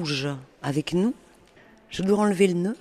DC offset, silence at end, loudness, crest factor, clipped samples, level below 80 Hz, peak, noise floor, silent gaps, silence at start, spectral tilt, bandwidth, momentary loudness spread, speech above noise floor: under 0.1%; 0.05 s; -25 LUFS; 18 dB; under 0.1%; -58 dBFS; -8 dBFS; -54 dBFS; none; 0 s; -6 dB/octave; 13.5 kHz; 12 LU; 30 dB